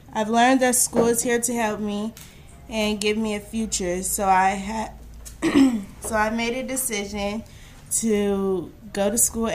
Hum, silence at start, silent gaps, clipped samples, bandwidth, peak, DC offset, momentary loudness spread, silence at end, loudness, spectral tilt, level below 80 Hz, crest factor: none; 0.05 s; none; under 0.1%; 15.5 kHz; -4 dBFS; under 0.1%; 12 LU; 0 s; -22 LUFS; -3 dB/octave; -44 dBFS; 20 dB